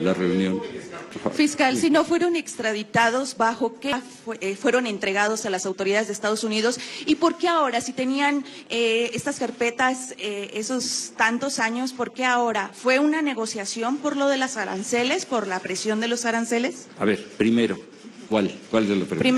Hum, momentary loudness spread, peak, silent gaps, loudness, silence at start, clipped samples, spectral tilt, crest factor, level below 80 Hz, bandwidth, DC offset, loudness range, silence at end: none; 8 LU; -8 dBFS; none; -23 LUFS; 0 s; under 0.1%; -3.5 dB/octave; 16 dB; -66 dBFS; 12.5 kHz; under 0.1%; 2 LU; 0 s